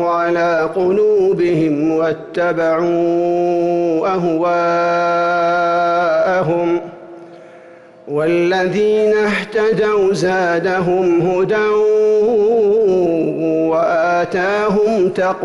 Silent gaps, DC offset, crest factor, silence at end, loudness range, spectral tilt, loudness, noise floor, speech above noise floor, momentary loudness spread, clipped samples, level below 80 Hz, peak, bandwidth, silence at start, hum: none; under 0.1%; 8 dB; 0 s; 3 LU; -6.5 dB/octave; -15 LUFS; -40 dBFS; 26 dB; 3 LU; under 0.1%; -52 dBFS; -8 dBFS; 11.5 kHz; 0 s; none